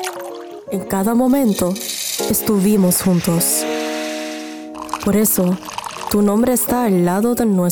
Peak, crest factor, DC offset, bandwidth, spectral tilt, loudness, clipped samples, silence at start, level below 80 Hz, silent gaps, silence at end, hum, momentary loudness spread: -6 dBFS; 12 dB; under 0.1%; 19.5 kHz; -5 dB/octave; -17 LUFS; under 0.1%; 0 s; -48 dBFS; none; 0 s; none; 13 LU